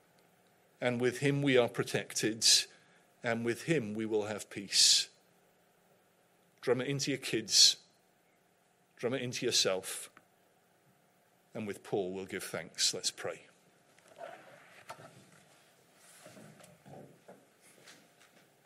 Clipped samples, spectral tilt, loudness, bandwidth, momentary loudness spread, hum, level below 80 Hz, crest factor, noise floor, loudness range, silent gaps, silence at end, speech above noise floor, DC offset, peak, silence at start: under 0.1%; -2 dB/octave; -30 LUFS; 16 kHz; 24 LU; none; -82 dBFS; 26 dB; -70 dBFS; 9 LU; none; 0.75 s; 38 dB; under 0.1%; -10 dBFS; 0.8 s